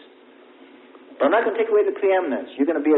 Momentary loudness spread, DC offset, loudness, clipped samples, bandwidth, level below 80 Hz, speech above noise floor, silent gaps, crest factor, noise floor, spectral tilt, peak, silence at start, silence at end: 4 LU; under 0.1%; -21 LUFS; under 0.1%; 4 kHz; -72 dBFS; 30 dB; none; 16 dB; -49 dBFS; -9 dB/octave; -6 dBFS; 1.1 s; 0 s